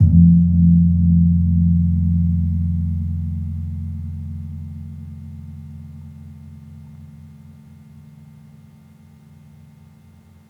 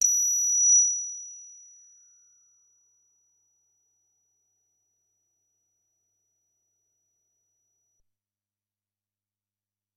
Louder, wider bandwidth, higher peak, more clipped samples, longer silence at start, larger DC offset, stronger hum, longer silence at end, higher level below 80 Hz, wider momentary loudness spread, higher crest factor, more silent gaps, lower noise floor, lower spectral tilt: first, -17 LUFS vs -20 LUFS; second, 0.9 kHz vs 12.5 kHz; first, -2 dBFS vs -8 dBFS; neither; about the same, 0 s vs 0 s; neither; neither; second, 3.2 s vs 8.45 s; first, -36 dBFS vs -88 dBFS; first, 26 LU vs 23 LU; second, 16 dB vs 24 dB; neither; second, -47 dBFS vs under -90 dBFS; first, -12 dB/octave vs 6 dB/octave